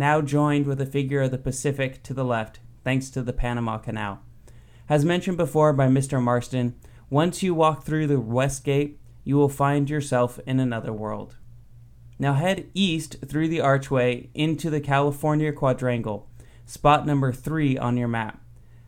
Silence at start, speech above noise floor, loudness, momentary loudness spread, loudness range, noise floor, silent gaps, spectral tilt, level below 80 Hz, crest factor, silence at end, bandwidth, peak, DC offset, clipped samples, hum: 0 s; 24 dB; -24 LUFS; 10 LU; 4 LU; -47 dBFS; none; -6.5 dB/octave; -44 dBFS; 18 dB; 0.1 s; 16 kHz; -4 dBFS; under 0.1%; under 0.1%; none